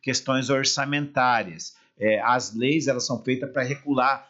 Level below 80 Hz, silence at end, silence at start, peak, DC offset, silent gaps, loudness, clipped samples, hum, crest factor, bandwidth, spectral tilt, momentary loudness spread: -70 dBFS; 0.05 s; 0.05 s; -10 dBFS; under 0.1%; none; -24 LUFS; under 0.1%; none; 14 dB; 8 kHz; -4 dB/octave; 6 LU